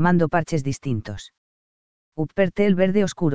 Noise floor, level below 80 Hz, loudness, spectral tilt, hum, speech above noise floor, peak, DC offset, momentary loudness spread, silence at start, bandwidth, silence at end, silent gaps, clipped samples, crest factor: under -90 dBFS; -50 dBFS; -22 LUFS; -7 dB/octave; none; over 69 dB; -4 dBFS; under 0.1%; 16 LU; 0 s; 8 kHz; 0 s; 1.38-2.12 s; under 0.1%; 18 dB